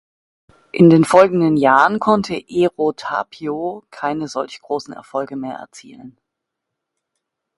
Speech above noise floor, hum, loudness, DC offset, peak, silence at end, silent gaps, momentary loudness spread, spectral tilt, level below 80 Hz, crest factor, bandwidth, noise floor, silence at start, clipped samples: 63 dB; none; -17 LUFS; under 0.1%; 0 dBFS; 1.5 s; none; 16 LU; -6.5 dB/octave; -58 dBFS; 18 dB; 11.5 kHz; -80 dBFS; 0.75 s; under 0.1%